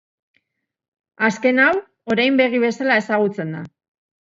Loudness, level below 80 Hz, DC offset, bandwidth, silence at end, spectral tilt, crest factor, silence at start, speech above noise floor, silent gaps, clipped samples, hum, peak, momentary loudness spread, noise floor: -18 LUFS; -66 dBFS; under 0.1%; 7.8 kHz; 0.55 s; -5.5 dB/octave; 18 dB; 1.2 s; 60 dB; none; under 0.1%; none; -2 dBFS; 13 LU; -78 dBFS